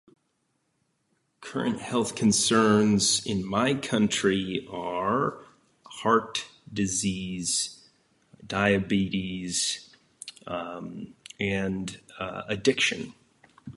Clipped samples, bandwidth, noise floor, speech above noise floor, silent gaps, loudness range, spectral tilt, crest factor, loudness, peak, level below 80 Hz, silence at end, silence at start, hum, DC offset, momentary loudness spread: under 0.1%; 11.5 kHz; -74 dBFS; 48 dB; none; 6 LU; -3.5 dB/octave; 20 dB; -26 LUFS; -8 dBFS; -56 dBFS; 0.05 s; 1.4 s; none; under 0.1%; 16 LU